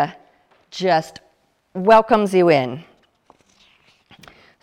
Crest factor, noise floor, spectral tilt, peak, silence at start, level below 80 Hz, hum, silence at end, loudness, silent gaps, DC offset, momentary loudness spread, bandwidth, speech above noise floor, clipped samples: 18 dB; -62 dBFS; -6 dB/octave; -2 dBFS; 0 s; -58 dBFS; none; 1.8 s; -17 LUFS; none; under 0.1%; 22 LU; 13 kHz; 46 dB; under 0.1%